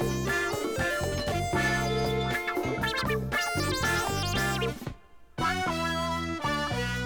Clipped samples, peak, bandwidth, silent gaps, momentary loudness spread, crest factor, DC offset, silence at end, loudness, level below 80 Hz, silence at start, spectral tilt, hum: under 0.1%; -16 dBFS; over 20 kHz; none; 4 LU; 14 dB; under 0.1%; 0 s; -28 LUFS; -44 dBFS; 0 s; -4.5 dB/octave; none